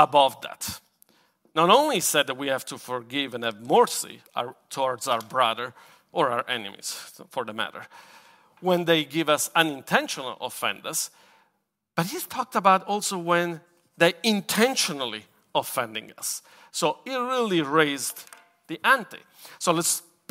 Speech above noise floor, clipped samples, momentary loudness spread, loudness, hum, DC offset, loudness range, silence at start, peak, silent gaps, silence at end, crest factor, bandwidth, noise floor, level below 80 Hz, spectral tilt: 49 dB; under 0.1%; 13 LU; -25 LUFS; none; under 0.1%; 4 LU; 0 s; 0 dBFS; none; 0.3 s; 26 dB; 16 kHz; -74 dBFS; -72 dBFS; -3 dB/octave